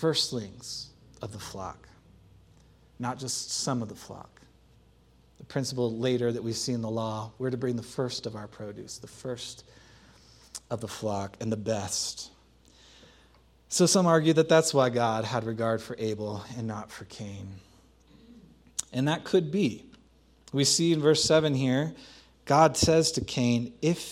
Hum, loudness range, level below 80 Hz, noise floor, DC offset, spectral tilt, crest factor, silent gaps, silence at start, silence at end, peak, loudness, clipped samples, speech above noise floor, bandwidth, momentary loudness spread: none; 12 LU; -58 dBFS; -60 dBFS; under 0.1%; -4.5 dB/octave; 24 dB; none; 0 s; 0 s; -6 dBFS; -28 LUFS; under 0.1%; 32 dB; 16 kHz; 19 LU